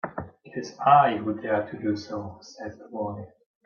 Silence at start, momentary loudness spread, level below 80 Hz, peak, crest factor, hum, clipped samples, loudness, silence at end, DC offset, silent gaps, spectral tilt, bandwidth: 0.05 s; 21 LU; -66 dBFS; -6 dBFS; 22 dB; none; under 0.1%; -25 LUFS; 0.4 s; under 0.1%; none; -6.5 dB/octave; 7 kHz